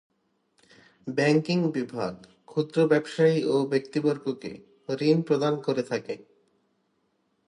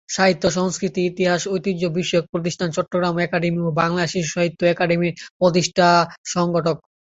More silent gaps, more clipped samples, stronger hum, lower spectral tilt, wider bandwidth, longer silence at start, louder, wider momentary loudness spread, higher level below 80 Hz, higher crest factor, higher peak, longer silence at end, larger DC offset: second, none vs 2.29-2.33 s, 5.30-5.40 s, 6.18-6.24 s; neither; neither; first, -7 dB/octave vs -5 dB/octave; first, 11 kHz vs 8 kHz; first, 1.05 s vs 0.1 s; second, -26 LUFS vs -20 LUFS; first, 14 LU vs 6 LU; second, -72 dBFS vs -54 dBFS; about the same, 18 dB vs 16 dB; second, -8 dBFS vs -2 dBFS; first, 1.3 s vs 0.25 s; neither